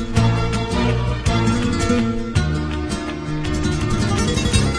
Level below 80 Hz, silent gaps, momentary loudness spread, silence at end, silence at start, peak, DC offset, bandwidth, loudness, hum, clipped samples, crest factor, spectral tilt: -26 dBFS; none; 6 LU; 0 s; 0 s; -2 dBFS; under 0.1%; 11 kHz; -20 LUFS; none; under 0.1%; 16 dB; -5.5 dB/octave